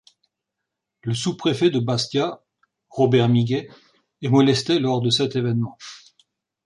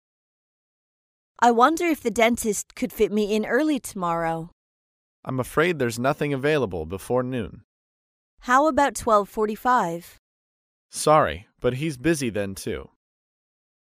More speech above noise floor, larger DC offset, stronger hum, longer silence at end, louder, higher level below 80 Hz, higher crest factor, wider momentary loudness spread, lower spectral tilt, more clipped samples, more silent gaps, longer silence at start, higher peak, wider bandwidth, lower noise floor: second, 62 dB vs over 67 dB; neither; neither; second, 0.7 s vs 1 s; about the same, -21 LUFS vs -23 LUFS; second, -60 dBFS vs -52 dBFS; about the same, 16 dB vs 20 dB; about the same, 15 LU vs 13 LU; about the same, -6 dB/octave vs -5 dB/octave; neither; second, none vs 4.52-5.23 s, 7.64-8.37 s, 10.19-10.89 s; second, 1.05 s vs 1.4 s; about the same, -6 dBFS vs -4 dBFS; second, 11 kHz vs 15.5 kHz; second, -82 dBFS vs under -90 dBFS